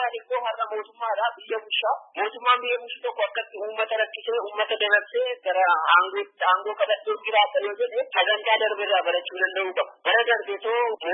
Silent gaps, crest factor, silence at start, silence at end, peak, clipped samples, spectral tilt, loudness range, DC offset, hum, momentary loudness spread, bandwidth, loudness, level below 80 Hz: none; 22 dB; 0 s; 0 s; -2 dBFS; under 0.1%; -3.5 dB/octave; 4 LU; under 0.1%; none; 8 LU; 4.1 kHz; -24 LUFS; under -90 dBFS